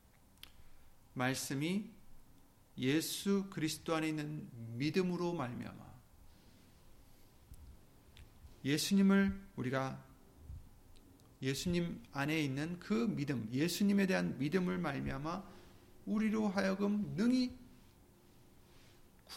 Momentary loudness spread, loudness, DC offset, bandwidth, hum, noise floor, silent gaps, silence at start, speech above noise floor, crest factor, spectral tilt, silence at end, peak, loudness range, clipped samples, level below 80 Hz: 20 LU; -36 LUFS; under 0.1%; 16.5 kHz; none; -63 dBFS; none; 0.45 s; 28 dB; 18 dB; -5.5 dB/octave; 0 s; -20 dBFS; 6 LU; under 0.1%; -60 dBFS